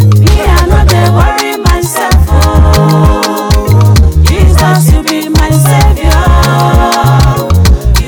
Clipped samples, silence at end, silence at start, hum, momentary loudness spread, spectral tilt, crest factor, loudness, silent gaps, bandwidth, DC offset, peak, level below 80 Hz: 8%; 0 s; 0 s; none; 4 LU; -5.5 dB/octave; 6 dB; -7 LUFS; none; 19.5 kHz; under 0.1%; 0 dBFS; -10 dBFS